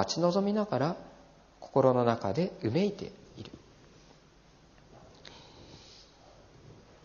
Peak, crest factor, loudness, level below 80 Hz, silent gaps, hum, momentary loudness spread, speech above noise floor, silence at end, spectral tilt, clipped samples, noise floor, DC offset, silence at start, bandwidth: -10 dBFS; 24 dB; -29 LUFS; -64 dBFS; none; none; 26 LU; 30 dB; 1.25 s; -6 dB/octave; under 0.1%; -59 dBFS; under 0.1%; 0 s; 7.2 kHz